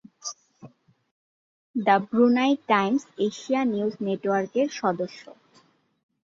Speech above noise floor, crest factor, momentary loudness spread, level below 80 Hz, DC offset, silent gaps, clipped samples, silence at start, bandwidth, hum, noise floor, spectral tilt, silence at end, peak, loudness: 37 dB; 22 dB; 16 LU; -72 dBFS; under 0.1%; 1.11-1.74 s; under 0.1%; 0.25 s; 7.6 kHz; none; -61 dBFS; -5 dB/octave; 1.05 s; -6 dBFS; -24 LUFS